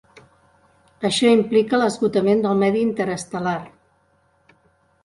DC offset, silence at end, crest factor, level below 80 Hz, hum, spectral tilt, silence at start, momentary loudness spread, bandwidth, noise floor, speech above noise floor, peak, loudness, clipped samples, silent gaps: under 0.1%; 1.35 s; 16 dB; -60 dBFS; none; -5 dB/octave; 1 s; 9 LU; 11.5 kHz; -62 dBFS; 43 dB; -4 dBFS; -20 LUFS; under 0.1%; none